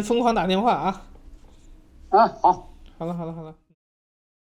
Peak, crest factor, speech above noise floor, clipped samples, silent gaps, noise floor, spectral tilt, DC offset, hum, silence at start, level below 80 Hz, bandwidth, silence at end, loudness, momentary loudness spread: -6 dBFS; 20 dB; 27 dB; under 0.1%; none; -48 dBFS; -6 dB/octave; under 0.1%; none; 0 s; -48 dBFS; 14.5 kHz; 0.95 s; -22 LUFS; 18 LU